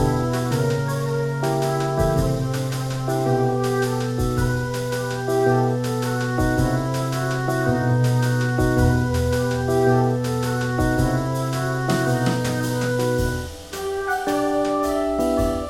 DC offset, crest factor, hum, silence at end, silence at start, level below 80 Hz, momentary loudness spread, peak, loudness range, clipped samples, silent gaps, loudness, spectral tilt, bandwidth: 0.1%; 16 dB; none; 0 s; 0 s; -36 dBFS; 5 LU; -4 dBFS; 2 LU; under 0.1%; none; -22 LUFS; -6.5 dB/octave; 16.5 kHz